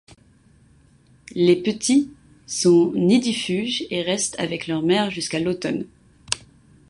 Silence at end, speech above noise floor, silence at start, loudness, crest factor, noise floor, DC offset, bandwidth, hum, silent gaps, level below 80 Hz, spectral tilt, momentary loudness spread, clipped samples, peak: 0.5 s; 34 dB; 1.35 s; -21 LUFS; 20 dB; -55 dBFS; under 0.1%; 11.5 kHz; none; none; -58 dBFS; -4.5 dB/octave; 11 LU; under 0.1%; -2 dBFS